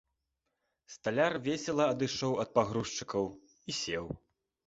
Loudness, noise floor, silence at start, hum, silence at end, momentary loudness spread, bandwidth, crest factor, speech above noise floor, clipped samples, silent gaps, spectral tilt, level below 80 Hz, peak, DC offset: -33 LUFS; -84 dBFS; 0.9 s; none; 0.5 s; 12 LU; 8.2 kHz; 22 dB; 52 dB; under 0.1%; none; -4.5 dB/octave; -64 dBFS; -12 dBFS; under 0.1%